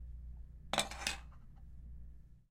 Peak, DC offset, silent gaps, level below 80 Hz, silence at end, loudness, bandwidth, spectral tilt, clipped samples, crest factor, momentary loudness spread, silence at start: -16 dBFS; under 0.1%; none; -52 dBFS; 0.05 s; -40 LUFS; 16 kHz; -2 dB/octave; under 0.1%; 30 dB; 21 LU; 0 s